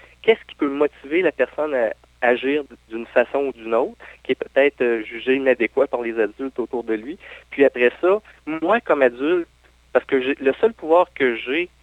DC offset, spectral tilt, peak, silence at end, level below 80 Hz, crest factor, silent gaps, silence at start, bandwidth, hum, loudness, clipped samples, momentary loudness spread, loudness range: under 0.1%; -6 dB/octave; -2 dBFS; 0.15 s; -56 dBFS; 18 dB; none; 0.25 s; 8.8 kHz; none; -21 LUFS; under 0.1%; 9 LU; 2 LU